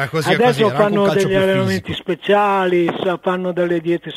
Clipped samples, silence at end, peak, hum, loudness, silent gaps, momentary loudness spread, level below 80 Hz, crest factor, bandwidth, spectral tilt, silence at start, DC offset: under 0.1%; 0 s; -2 dBFS; none; -16 LUFS; none; 6 LU; -50 dBFS; 14 dB; 15.5 kHz; -6 dB/octave; 0 s; under 0.1%